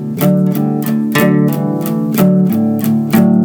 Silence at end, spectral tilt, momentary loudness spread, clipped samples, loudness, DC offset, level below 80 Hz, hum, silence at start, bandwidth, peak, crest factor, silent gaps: 0 s; -7 dB/octave; 5 LU; under 0.1%; -13 LUFS; under 0.1%; -52 dBFS; none; 0 s; over 20 kHz; 0 dBFS; 12 dB; none